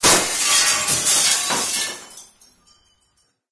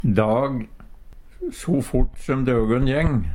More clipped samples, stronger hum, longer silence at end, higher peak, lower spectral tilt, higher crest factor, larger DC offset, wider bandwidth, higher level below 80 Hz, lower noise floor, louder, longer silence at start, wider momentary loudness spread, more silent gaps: neither; neither; first, 1.3 s vs 0 s; first, 0 dBFS vs -4 dBFS; second, 0 dB/octave vs -7.5 dB/octave; about the same, 20 dB vs 18 dB; neither; second, 11 kHz vs 16 kHz; second, -52 dBFS vs -30 dBFS; first, -65 dBFS vs -41 dBFS; first, -16 LUFS vs -22 LUFS; about the same, 0 s vs 0.05 s; second, 9 LU vs 13 LU; neither